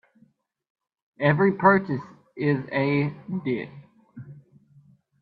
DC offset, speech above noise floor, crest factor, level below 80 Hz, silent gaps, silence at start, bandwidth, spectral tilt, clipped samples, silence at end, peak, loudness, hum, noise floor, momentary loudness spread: under 0.1%; 40 dB; 24 dB; -66 dBFS; none; 1.2 s; 4.9 kHz; -10 dB/octave; under 0.1%; 0.8 s; -2 dBFS; -24 LUFS; none; -63 dBFS; 25 LU